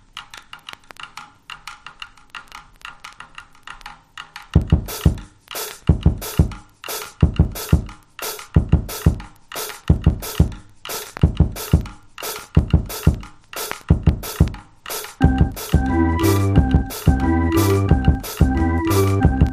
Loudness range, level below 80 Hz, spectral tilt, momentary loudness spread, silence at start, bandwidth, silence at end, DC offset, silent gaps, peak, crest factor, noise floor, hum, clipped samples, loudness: 12 LU; -24 dBFS; -6.5 dB/octave; 20 LU; 0.15 s; 15.5 kHz; 0 s; under 0.1%; none; 0 dBFS; 20 dB; -41 dBFS; none; under 0.1%; -20 LUFS